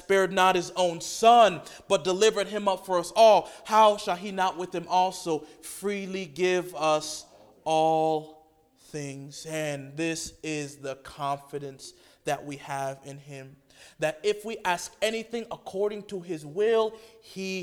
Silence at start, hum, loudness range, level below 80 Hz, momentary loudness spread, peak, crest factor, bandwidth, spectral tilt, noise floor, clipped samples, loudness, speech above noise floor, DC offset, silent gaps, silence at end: 0.1 s; none; 11 LU; -64 dBFS; 18 LU; -6 dBFS; 20 dB; 18 kHz; -3.5 dB/octave; -60 dBFS; under 0.1%; -26 LUFS; 33 dB; under 0.1%; none; 0 s